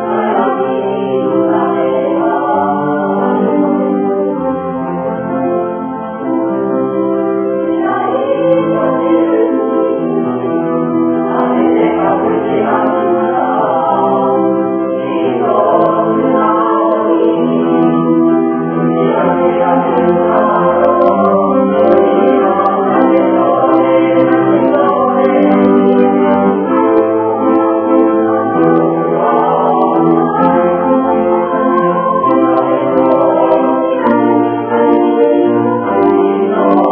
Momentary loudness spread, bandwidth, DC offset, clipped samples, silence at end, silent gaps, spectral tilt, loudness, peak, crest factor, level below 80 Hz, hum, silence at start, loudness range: 5 LU; 3.5 kHz; under 0.1%; 0.1%; 0 s; none; -11 dB/octave; -12 LUFS; 0 dBFS; 10 dB; -54 dBFS; none; 0 s; 4 LU